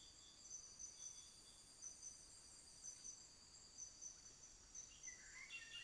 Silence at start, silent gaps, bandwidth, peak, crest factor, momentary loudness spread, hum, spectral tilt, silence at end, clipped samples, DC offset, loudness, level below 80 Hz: 0 s; none; 11 kHz; -44 dBFS; 16 dB; 7 LU; none; 0.5 dB/octave; 0 s; under 0.1%; under 0.1%; -57 LUFS; -76 dBFS